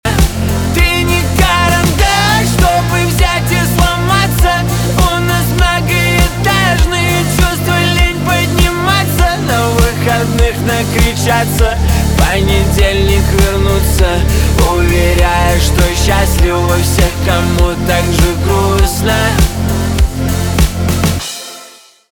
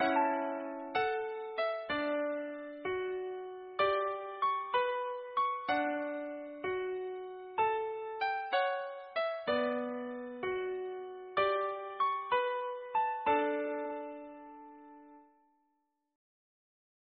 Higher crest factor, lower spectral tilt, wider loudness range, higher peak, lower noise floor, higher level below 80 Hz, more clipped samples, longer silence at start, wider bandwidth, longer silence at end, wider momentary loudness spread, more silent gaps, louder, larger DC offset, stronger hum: second, 10 dB vs 18 dB; first, -4.5 dB/octave vs -1 dB/octave; about the same, 1 LU vs 3 LU; first, 0 dBFS vs -18 dBFS; second, -38 dBFS vs -80 dBFS; first, -16 dBFS vs -74 dBFS; neither; about the same, 0.05 s vs 0 s; first, over 20 kHz vs 5 kHz; second, 0.4 s vs 1.95 s; second, 3 LU vs 11 LU; neither; first, -11 LUFS vs -35 LUFS; neither; neither